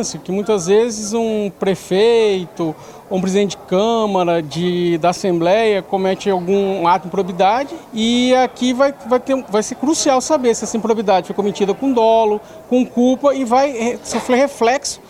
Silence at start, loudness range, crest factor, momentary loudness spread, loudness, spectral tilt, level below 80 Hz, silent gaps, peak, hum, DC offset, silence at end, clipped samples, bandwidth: 0 s; 1 LU; 12 dB; 7 LU; -16 LUFS; -4.5 dB/octave; -52 dBFS; none; -4 dBFS; none; under 0.1%; 0.1 s; under 0.1%; 16 kHz